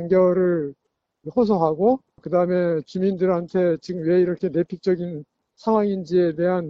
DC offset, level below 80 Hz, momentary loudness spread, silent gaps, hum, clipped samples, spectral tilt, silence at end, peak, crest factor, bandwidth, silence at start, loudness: under 0.1%; -58 dBFS; 8 LU; none; none; under 0.1%; -9 dB/octave; 0 s; -6 dBFS; 16 dB; 7 kHz; 0 s; -21 LUFS